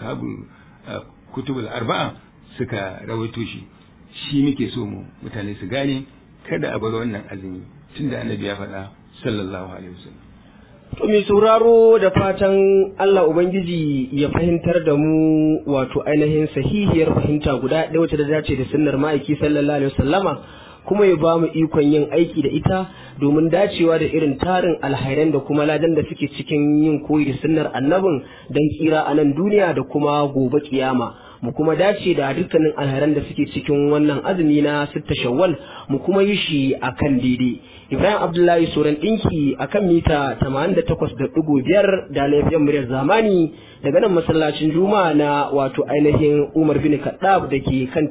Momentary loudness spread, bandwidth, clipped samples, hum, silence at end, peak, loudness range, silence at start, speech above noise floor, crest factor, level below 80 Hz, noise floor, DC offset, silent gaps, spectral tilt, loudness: 12 LU; 4 kHz; under 0.1%; none; 0 s; -2 dBFS; 9 LU; 0 s; 28 dB; 16 dB; -42 dBFS; -46 dBFS; under 0.1%; none; -11.5 dB/octave; -18 LUFS